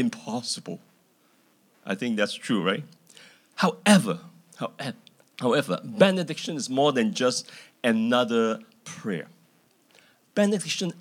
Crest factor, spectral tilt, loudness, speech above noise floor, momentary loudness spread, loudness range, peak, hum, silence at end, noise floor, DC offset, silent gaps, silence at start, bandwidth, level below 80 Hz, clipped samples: 22 dB; -4.5 dB/octave; -26 LUFS; 38 dB; 19 LU; 5 LU; -4 dBFS; none; 0 s; -63 dBFS; under 0.1%; none; 0 s; 16.5 kHz; -86 dBFS; under 0.1%